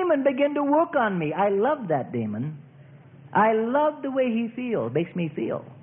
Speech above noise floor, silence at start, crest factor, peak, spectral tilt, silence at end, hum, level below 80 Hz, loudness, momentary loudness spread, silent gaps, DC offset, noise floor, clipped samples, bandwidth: 25 dB; 0 s; 16 dB; -10 dBFS; -11.5 dB/octave; 0 s; none; -68 dBFS; -24 LUFS; 9 LU; none; under 0.1%; -48 dBFS; under 0.1%; 3.6 kHz